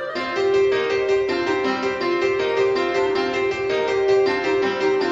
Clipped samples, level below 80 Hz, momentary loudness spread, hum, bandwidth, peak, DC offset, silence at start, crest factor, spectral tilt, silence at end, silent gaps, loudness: under 0.1%; -54 dBFS; 4 LU; none; 7.8 kHz; -8 dBFS; under 0.1%; 0 s; 12 dB; -4.5 dB/octave; 0 s; none; -20 LUFS